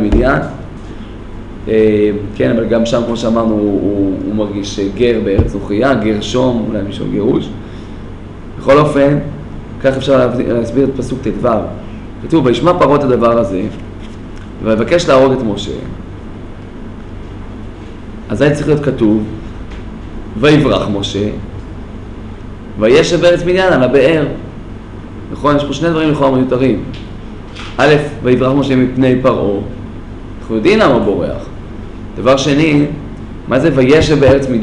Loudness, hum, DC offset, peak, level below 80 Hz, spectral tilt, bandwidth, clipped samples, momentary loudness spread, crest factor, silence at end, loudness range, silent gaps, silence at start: -12 LUFS; none; under 0.1%; 0 dBFS; -30 dBFS; -6.5 dB/octave; 11 kHz; under 0.1%; 20 LU; 12 dB; 0 s; 4 LU; none; 0 s